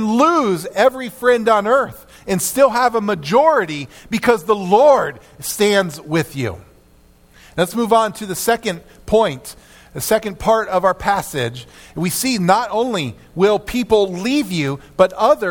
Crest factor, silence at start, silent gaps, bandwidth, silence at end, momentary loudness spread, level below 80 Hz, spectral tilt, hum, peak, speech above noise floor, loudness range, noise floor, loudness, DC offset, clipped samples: 18 dB; 0 s; none; 18 kHz; 0 s; 12 LU; -46 dBFS; -4.5 dB/octave; none; 0 dBFS; 33 dB; 4 LU; -50 dBFS; -17 LUFS; under 0.1%; under 0.1%